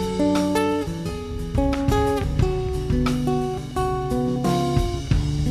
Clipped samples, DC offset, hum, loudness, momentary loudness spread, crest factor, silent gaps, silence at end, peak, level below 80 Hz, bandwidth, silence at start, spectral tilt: under 0.1%; under 0.1%; none; -23 LUFS; 6 LU; 16 dB; none; 0 s; -6 dBFS; -30 dBFS; 14 kHz; 0 s; -6.5 dB/octave